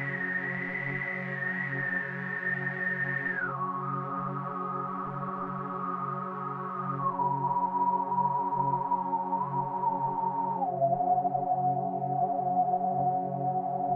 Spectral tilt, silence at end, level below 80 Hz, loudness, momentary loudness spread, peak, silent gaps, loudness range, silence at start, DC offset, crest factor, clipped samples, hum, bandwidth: -9.5 dB/octave; 0 s; -72 dBFS; -30 LUFS; 6 LU; -16 dBFS; none; 4 LU; 0 s; under 0.1%; 14 dB; under 0.1%; none; 4.8 kHz